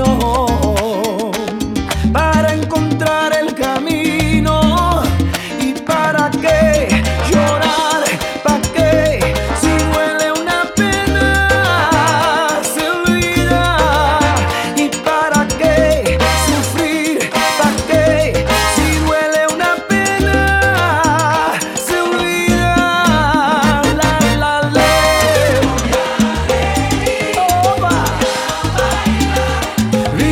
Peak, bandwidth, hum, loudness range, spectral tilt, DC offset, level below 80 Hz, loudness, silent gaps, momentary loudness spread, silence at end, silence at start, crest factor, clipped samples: 0 dBFS; 18 kHz; none; 2 LU; -4.5 dB/octave; under 0.1%; -24 dBFS; -13 LUFS; none; 4 LU; 0 s; 0 s; 14 dB; under 0.1%